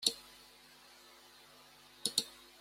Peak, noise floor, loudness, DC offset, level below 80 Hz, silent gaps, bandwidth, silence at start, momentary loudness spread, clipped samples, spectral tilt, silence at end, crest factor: -14 dBFS; -60 dBFS; -37 LUFS; under 0.1%; -78 dBFS; none; 16.5 kHz; 0 s; 23 LU; under 0.1%; 0.5 dB/octave; 0.2 s; 30 dB